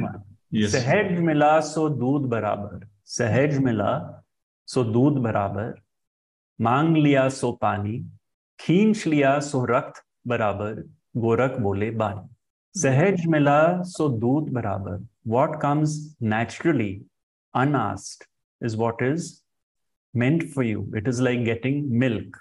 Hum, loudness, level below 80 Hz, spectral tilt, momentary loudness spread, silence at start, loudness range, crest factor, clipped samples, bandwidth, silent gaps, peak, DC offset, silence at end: none; -23 LUFS; -62 dBFS; -6.5 dB/octave; 14 LU; 0 s; 4 LU; 16 dB; under 0.1%; 11.5 kHz; 4.43-4.66 s, 6.07-6.56 s, 8.34-8.58 s, 12.50-12.72 s, 17.23-17.52 s, 18.44-18.59 s, 19.63-19.75 s, 19.97-20.13 s; -6 dBFS; under 0.1%; 0.1 s